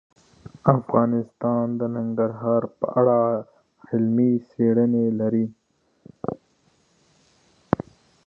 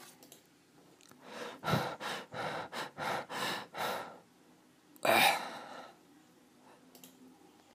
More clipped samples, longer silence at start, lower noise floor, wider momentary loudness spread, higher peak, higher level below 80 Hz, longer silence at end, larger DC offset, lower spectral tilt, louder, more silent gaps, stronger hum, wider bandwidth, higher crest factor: neither; first, 0.45 s vs 0 s; about the same, -63 dBFS vs -64 dBFS; second, 12 LU vs 28 LU; first, 0 dBFS vs -12 dBFS; first, -60 dBFS vs -74 dBFS; first, 1.95 s vs 0.4 s; neither; first, -11 dB/octave vs -3 dB/octave; first, -23 LUFS vs -34 LUFS; neither; neither; second, 2.4 kHz vs 15.5 kHz; about the same, 22 dB vs 26 dB